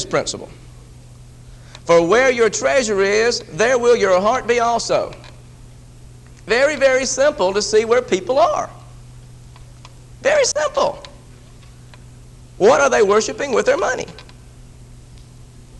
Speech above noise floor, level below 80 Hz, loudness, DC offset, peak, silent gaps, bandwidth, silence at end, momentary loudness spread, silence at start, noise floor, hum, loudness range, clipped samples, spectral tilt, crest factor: 25 dB; -44 dBFS; -16 LUFS; under 0.1%; -2 dBFS; none; 11.5 kHz; 0 s; 12 LU; 0 s; -41 dBFS; none; 5 LU; under 0.1%; -3 dB/octave; 18 dB